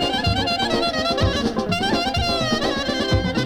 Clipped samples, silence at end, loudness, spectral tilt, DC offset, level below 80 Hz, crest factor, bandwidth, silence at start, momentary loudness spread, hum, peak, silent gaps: under 0.1%; 0 s; -20 LUFS; -5 dB/octave; under 0.1%; -34 dBFS; 14 dB; 18.5 kHz; 0 s; 2 LU; none; -6 dBFS; none